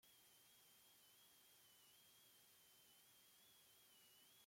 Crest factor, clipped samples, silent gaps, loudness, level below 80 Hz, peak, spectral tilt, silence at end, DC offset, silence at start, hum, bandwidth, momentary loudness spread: 14 dB; under 0.1%; none; -69 LUFS; under -90 dBFS; -58 dBFS; -0.5 dB/octave; 0 s; under 0.1%; 0 s; none; 16.5 kHz; 1 LU